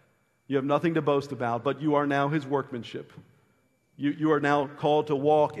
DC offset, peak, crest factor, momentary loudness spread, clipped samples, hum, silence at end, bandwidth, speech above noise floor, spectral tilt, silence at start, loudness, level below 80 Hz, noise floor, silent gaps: under 0.1%; -10 dBFS; 18 dB; 8 LU; under 0.1%; none; 0 s; 11 kHz; 42 dB; -7.5 dB/octave; 0.5 s; -26 LUFS; -70 dBFS; -68 dBFS; none